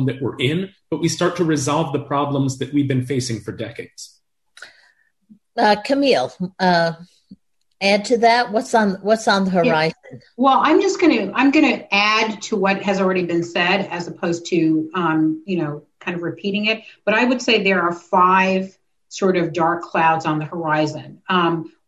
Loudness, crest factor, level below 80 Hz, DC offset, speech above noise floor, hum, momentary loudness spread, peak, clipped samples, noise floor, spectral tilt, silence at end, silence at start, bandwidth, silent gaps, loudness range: -18 LUFS; 16 dB; -60 dBFS; under 0.1%; 40 dB; none; 11 LU; -4 dBFS; under 0.1%; -59 dBFS; -5 dB/octave; 0.2 s; 0 s; 12 kHz; none; 6 LU